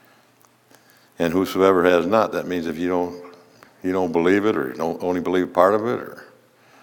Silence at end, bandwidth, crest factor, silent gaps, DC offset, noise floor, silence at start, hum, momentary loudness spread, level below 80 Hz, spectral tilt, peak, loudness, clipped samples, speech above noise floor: 0.55 s; 18 kHz; 22 dB; none; under 0.1%; -57 dBFS; 1.2 s; none; 10 LU; -64 dBFS; -6 dB/octave; 0 dBFS; -21 LUFS; under 0.1%; 37 dB